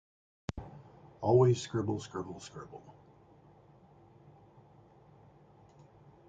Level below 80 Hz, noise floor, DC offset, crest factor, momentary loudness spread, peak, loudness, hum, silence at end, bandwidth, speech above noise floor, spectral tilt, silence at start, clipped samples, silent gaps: -62 dBFS; -60 dBFS; under 0.1%; 24 dB; 25 LU; -14 dBFS; -32 LUFS; none; 3.35 s; 9 kHz; 29 dB; -7 dB/octave; 0.55 s; under 0.1%; none